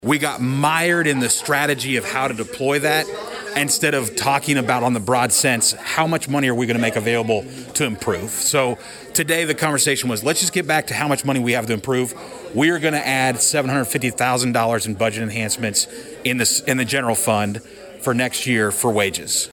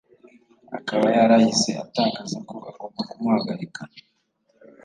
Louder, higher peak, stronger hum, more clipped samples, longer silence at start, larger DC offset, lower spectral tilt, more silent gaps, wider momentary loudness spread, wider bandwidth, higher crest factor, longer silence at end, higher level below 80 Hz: first, -19 LUFS vs -22 LUFS; about the same, -4 dBFS vs -6 dBFS; neither; neither; second, 0 s vs 0.7 s; neither; second, -3 dB/octave vs -4.5 dB/octave; neither; second, 6 LU vs 21 LU; first, 19 kHz vs 9.6 kHz; about the same, 16 dB vs 18 dB; second, 0 s vs 0.85 s; first, -56 dBFS vs -70 dBFS